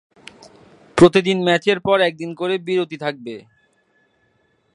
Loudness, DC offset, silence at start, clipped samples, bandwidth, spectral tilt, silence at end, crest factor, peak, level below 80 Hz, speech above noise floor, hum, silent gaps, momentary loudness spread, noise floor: -18 LUFS; under 0.1%; 0.95 s; under 0.1%; 11 kHz; -5.5 dB/octave; 1.35 s; 20 dB; 0 dBFS; -52 dBFS; 45 dB; none; none; 16 LU; -63 dBFS